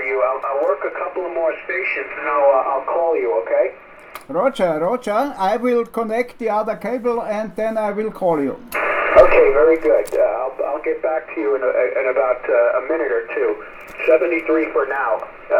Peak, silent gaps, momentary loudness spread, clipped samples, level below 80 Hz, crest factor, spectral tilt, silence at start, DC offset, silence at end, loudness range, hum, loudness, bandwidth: 0 dBFS; none; 9 LU; under 0.1%; -42 dBFS; 18 dB; -6 dB/octave; 0 s; under 0.1%; 0 s; 5 LU; none; -18 LUFS; 17 kHz